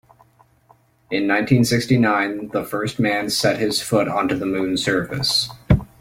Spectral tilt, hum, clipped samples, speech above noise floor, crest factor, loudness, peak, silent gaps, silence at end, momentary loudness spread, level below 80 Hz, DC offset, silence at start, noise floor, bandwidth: -5 dB/octave; none; under 0.1%; 36 dB; 18 dB; -20 LUFS; -2 dBFS; none; 0.15 s; 7 LU; -40 dBFS; under 0.1%; 1.1 s; -56 dBFS; 16.5 kHz